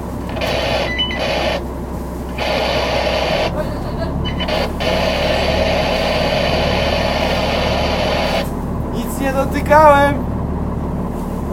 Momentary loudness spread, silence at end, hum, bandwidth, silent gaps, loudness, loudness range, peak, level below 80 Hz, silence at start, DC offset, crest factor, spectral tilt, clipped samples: 8 LU; 0 s; none; 16.5 kHz; none; -17 LUFS; 4 LU; 0 dBFS; -26 dBFS; 0 s; under 0.1%; 16 dB; -5.5 dB/octave; under 0.1%